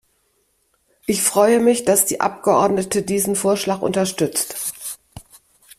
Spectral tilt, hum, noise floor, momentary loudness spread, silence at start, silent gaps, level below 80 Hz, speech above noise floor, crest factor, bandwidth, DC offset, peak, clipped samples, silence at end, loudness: -3.5 dB/octave; none; -65 dBFS; 11 LU; 1.1 s; none; -56 dBFS; 47 dB; 18 dB; 16 kHz; under 0.1%; -2 dBFS; under 0.1%; 0.6 s; -18 LUFS